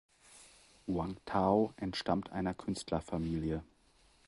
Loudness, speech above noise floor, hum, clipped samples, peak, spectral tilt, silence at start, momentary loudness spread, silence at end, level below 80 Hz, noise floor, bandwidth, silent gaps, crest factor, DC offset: -36 LUFS; 33 dB; none; under 0.1%; -16 dBFS; -6.5 dB/octave; 0.3 s; 11 LU; 0.65 s; -54 dBFS; -67 dBFS; 11.5 kHz; none; 22 dB; under 0.1%